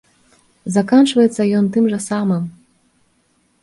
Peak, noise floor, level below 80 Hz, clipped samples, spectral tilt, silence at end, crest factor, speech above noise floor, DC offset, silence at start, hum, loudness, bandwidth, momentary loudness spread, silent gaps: -2 dBFS; -61 dBFS; -60 dBFS; under 0.1%; -6 dB/octave; 1.1 s; 16 dB; 46 dB; under 0.1%; 0.65 s; none; -16 LUFS; 11.5 kHz; 10 LU; none